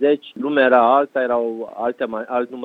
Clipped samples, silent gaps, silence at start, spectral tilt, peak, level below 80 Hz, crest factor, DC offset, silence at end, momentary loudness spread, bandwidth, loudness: under 0.1%; none; 0 s; -7 dB/octave; -2 dBFS; -64 dBFS; 16 dB; under 0.1%; 0 s; 11 LU; 4.7 kHz; -19 LUFS